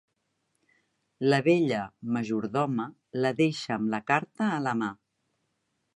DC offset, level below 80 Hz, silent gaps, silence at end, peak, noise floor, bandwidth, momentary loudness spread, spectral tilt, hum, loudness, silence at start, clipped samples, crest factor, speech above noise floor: under 0.1%; -72 dBFS; none; 1 s; -8 dBFS; -78 dBFS; 11 kHz; 8 LU; -6.5 dB/octave; none; -28 LUFS; 1.2 s; under 0.1%; 22 dB; 50 dB